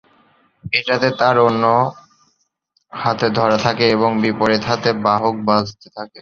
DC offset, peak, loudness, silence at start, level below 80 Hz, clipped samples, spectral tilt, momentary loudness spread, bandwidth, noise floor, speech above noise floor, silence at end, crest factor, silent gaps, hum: under 0.1%; 0 dBFS; -16 LUFS; 0.65 s; -52 dBFS; under 0.1%; -5.5 dB/octave; 10 LU; 7.4 kHz; -66 dBFS; 49 dB; 0 s; 18 dB; none; none